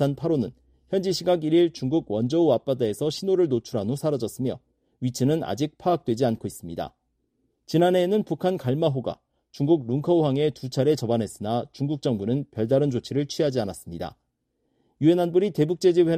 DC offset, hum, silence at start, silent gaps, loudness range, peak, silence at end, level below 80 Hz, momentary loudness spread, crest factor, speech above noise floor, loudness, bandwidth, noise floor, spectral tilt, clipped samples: under 0.1%; none; 0 s; none; 3 LU; -8 dBFS; 0 s; -60 dBFS; 11 LU; 16 dB; 51 dB; -24 LUFS; 15 kHz; -75 dBFS; -7 dB/octave; under 0.1%